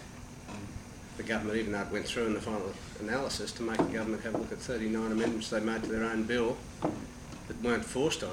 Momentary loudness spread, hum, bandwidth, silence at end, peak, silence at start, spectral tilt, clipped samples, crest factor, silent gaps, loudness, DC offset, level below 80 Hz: 13 LU; none; 16.5 kHz; 0 s; -14 dBFS; 0 s; -4.5 dB/octave; under 0.1%; 18 dB; none; -34 LUFS; under 0.1%; -52 dBFS